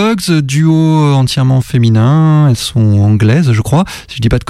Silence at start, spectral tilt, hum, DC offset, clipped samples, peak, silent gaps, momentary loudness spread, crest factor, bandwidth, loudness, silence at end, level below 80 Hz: 0 s; -6.5 dB/octave; none; under 0.1%; under 0.1%; 0 dBFS; none; 4 LU; 8 dB; 14 kHz; -10 LUFS; 0.05 s; -32 dBFS